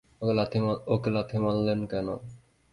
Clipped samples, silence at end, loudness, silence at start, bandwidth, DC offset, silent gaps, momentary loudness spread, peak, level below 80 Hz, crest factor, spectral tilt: under 0.1%; 0.35 s; -28 LUFS; 0.2 s; 11 kHz; under 0.1%; none; 8 LU; -12 dBFS; -56 dBFS; 16 dB; -8.5 dB/octave